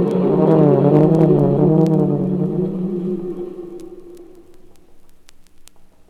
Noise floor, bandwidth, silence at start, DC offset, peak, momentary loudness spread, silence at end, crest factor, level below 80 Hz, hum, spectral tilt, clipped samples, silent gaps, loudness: -41 dBFS; 6.2 kHz; 0 s; under 0.1%; -2 dBFS; 18 LU; 0.25 s; 16 dB; -50 dBFS; none; -10.5 dB/octave; under 0.1%; none; -16 LUFS